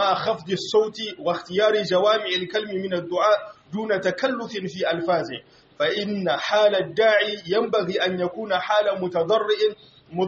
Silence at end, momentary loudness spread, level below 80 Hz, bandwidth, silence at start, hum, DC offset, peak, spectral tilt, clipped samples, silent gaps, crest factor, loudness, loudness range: 0 s; 8 LU; -68 dBFS; 8 kHz; 0 s; none; under 0.1%; -6 dBFS; -2.5 dB/octave; under 0.1%; none; 16 dB; -23 LUFS; 3 LU